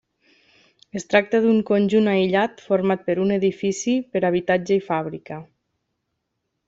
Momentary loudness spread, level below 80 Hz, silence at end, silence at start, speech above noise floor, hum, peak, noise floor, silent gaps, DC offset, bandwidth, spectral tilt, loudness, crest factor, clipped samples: 14 LU; -64 dBFS; 1.25 s; 0.95 s; 57 dB; none; -4 dBFS; -77 dBFS; none; under 0.1%; 8 kHz; -6 dB/octave; -21 LUFS; 18 dB; under 0.1%